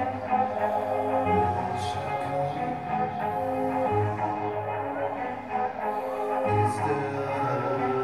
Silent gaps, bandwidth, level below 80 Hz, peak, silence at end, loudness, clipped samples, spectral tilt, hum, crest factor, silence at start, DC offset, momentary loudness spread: none; 15.5 kHz; -58 dBFS; -12 dBFS; 0 s; -28 LUFS; under 0.1%; -7 dB/octave; none; 16 dB; 0 s; 0.1%; 5 LU